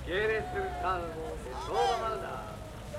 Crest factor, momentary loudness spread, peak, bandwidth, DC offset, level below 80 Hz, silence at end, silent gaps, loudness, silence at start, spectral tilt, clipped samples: 16 dB; 10 LU; -18 dBFS; 16 kHz; under 0.1%; -46 dBFS; 0 s; none; -33 LUFS; 0 s; -5 dB/octave; under 0.1%